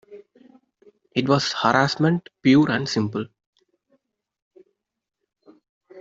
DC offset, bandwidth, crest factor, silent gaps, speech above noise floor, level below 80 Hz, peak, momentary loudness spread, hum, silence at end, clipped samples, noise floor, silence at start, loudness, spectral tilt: under 0.1%; 7.8 kHz; 22 dB; 3.46-3.53 s, 4.42-4.51 s, 5.69-5.81 s; 63 dB; -62 dBFS; -2 dBFS; 11 LU; none; 0 s; under 0.1%; -83 dBFS; 0.1 s; -21 LUFS; -5.5 dB/octave